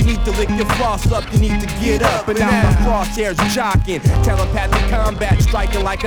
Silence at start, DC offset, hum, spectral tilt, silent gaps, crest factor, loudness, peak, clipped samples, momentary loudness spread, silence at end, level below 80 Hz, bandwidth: 0 s; under 0.1%; none; -5.5 dB/octave; none; 14 dB; -17 LUFS; 0 dBFS; under 0.1%; 4 LU; 0 s; -20 dBFS; 19.5 kHz